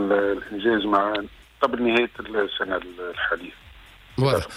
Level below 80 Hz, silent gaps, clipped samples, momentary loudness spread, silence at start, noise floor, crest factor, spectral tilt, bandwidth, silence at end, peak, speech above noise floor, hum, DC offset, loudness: -50 dBFS; none; under 0.1%; 10 LU; 0 s; -47 dBFS; 16 dB; -6 dB/octave; 15.5 kHz; 0 s; -8 dBFS; 24 dB; none; under 0.1%; -24 LUFS